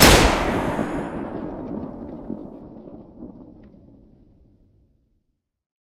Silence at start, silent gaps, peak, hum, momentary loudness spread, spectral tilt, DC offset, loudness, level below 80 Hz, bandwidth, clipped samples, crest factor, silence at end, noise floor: 0 s; none; 0 dBFS; none; 24 LU; -3.5 dB/octave; under 0.1%; -23 LUFS; -32 dBFS; 16 kHz; under 0.1%; 24 dB; 2.35 s; -73 dBFS